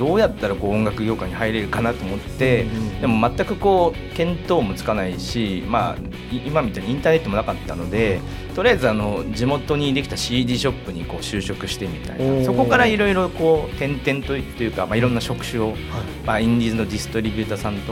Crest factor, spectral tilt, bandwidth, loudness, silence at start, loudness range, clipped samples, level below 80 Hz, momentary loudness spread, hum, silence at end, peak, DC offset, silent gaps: 18 dB; -6 dB/octave; 16.5 kHz; -21 LUFS; 0 s; 3 LU; under 0.1%; -36 dBFS; 8 LU; none; 0 s; -2 dBFS; under 0.1%; none